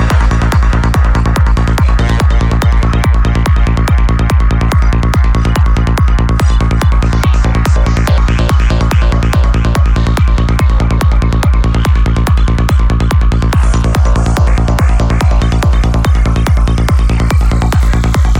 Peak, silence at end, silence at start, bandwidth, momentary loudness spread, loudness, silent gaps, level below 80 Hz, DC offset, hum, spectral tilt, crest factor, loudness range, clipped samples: 0 dBFS; 0 s; 0 s; 13 kHz; 0 LU; -11 LUFS; none; -10 dBFS; under 0.1%; none; -6.5 dB/octave; 8 dB; 0 LU; under 0.1%